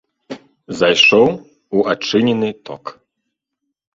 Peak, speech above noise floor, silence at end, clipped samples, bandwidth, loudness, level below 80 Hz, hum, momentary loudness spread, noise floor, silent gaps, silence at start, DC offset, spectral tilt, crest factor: 0 dBFS; 62 dB; 1.05 s; under 0.1%; 7.8 kHz; -14 LUFS; -58 dBFS; none; 25 LU; -76 dBFS; none; 0.3 s; under 0.1%; -4 dB/octave; 18 dB